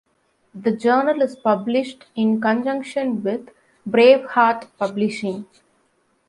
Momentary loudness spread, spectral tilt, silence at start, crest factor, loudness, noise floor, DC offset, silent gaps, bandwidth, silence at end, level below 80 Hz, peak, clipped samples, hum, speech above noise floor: 13 LU; -6 dB/octave; 0.55 s; 18 dB; -20 LUFS; -64 dBFS; under 0.1%; none; 11 kHz; 0.85 s; -70 dBFS; -2 dBFS; under 0.1%; none; 45 dB